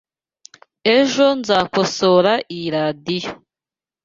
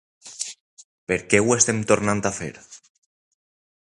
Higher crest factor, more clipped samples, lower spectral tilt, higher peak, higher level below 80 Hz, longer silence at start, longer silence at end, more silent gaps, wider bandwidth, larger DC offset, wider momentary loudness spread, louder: second, 18 dB vs 24 dB; neither; about the same, -4.5 dB/octave vs -3.5 dB/octave; about the same, -2 dBFS vs -2 dBFS; about the same, -58 dBFS vs -54 dBFS; first, 0.85 s vs 0.25 s; second, 0.7 s vs 1.1 s; second, none vs 0.60-0.77 s, 0.84-1.07 s; second, 7.8 kHz vs 11.5 kHz; neither; second, 10 LU vs 16 LU; first, -17 LUFS vs -21 LUFS